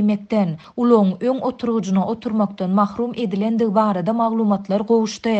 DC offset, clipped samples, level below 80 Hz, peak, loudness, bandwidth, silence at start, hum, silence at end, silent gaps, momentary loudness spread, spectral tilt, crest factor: under 0.1%; under 0.1%; -60 dBFS; -4 dBFS; -19 LUFS; 8 kHz; 0 s; none; 0 s; none; 6 LU; -7.5 dB/octave; 16 dB